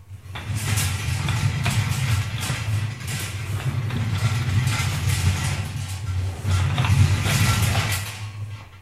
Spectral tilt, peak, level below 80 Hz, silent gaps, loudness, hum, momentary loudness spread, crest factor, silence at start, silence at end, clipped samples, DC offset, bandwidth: -4.5 dB/octave; -6 dBFS; -38 dBFS; none; -23 LUFS; none; 10 LU; 18 dB; 0 s; 0 s; under 0.1%; under 0.1%; 15.5 kHz